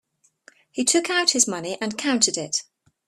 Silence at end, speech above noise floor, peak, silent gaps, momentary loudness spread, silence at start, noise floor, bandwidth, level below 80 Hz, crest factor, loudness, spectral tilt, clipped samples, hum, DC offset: 0.45 s; 33 dB; -4 dBFS; none; 9 LU; 0.75 s; -56 dBFS; 14.5 kHz; -70 dBFS; 22 dB; -21 LUFS; -1 dB/octave; under 0.1%; none; under 0.1%